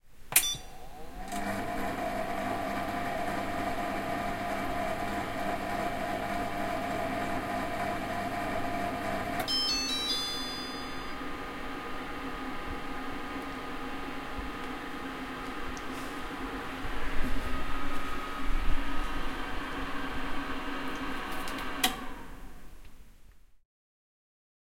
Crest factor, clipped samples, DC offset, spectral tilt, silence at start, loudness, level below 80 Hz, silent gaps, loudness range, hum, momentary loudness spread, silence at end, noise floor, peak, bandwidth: 26 dB; under 0.1%; under 0.1%; -3 dB/octave; 0.05 s; -34 LUFS; -42 dBFS; none; 7 LU; none; 9 LU; 1.05 s; -53 dBFS; -6 dBFS; 16.5 kHz